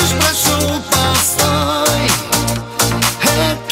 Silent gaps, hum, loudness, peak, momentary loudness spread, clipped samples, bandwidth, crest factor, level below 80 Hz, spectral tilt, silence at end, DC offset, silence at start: none; none; -13 LUFS; 0 dBFS; 4 LU; under 0.1%; 16.5 kHz; 14 dB; -34 dBFS; -3 dB/octave; 0 s; under 0.1%; 0 s